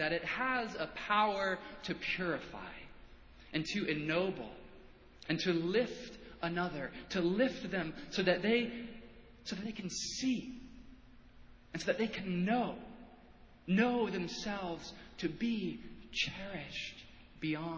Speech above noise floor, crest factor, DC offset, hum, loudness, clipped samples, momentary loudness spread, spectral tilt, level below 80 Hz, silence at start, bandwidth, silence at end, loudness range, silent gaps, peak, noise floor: 23 dB; 22 dB; under 0.1%; none; -36 LUFS; under 0.1%; 17 LU; -5 dB/octave; -62 dBFS; 0 s; 8 kHz; 0 s; 4 LU; none; -16 dBFS; -59 dBFS